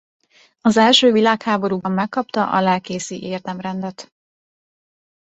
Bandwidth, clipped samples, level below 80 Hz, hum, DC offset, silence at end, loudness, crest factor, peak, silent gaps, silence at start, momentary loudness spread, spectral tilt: 8.2 kHz; under 0.1%; -62 dBFS; none; under 0.1%; 1.2 s; -18 LUFS; 18 dB; -2 dBFS; none; 0.65 s; 15 LU; -4.5 dB/octave